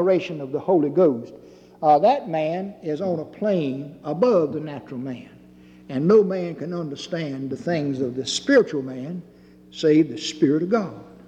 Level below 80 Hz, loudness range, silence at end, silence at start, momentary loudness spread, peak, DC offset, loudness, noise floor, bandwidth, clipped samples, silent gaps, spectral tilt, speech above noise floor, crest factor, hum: -64 dBFS; 3 LU; 0.2 s; 0 s; 15 LU; -6 dBFS; under 0.1%; -22 LUFS; -48 dBFS; 9.6 kHz; under 0.1%; none; -6 dB/octave; 26 dB; 16 dB; none